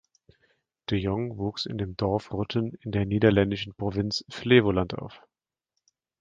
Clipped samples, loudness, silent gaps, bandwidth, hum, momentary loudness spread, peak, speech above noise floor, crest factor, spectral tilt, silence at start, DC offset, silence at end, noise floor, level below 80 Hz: under 0.1%; -26 LUFS; none; 7.6 kHz; none; 11 LU; -4 dBFS; 57 dB; 22 dB; -7 dB/octave; 0.9 s; under 0.1%; 1 s; -83 dBFS; -48 dBFS